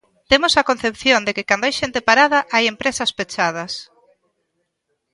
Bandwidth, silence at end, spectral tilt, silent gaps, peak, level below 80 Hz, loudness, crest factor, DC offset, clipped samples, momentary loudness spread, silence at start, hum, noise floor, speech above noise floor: 11.5 kHz; 1.3 s; -2 dB/octave; none; 0 dBFS; -50 dBFS; -17 LUFS; 20 dB; under 0.1%; under 0.1%; 8 LU; 0.3 s; none; -73 dBFS; 55 dB